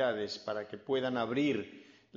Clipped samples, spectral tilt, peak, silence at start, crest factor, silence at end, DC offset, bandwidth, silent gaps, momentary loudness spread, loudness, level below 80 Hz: under 0.1%; -3.5 dB/octave; -20 dBFS; 0 s; 14 dB; 0.35 s; under 0.1%; 7.4 kHz; none; 8 LU; -34 LUFS; -74 dBFS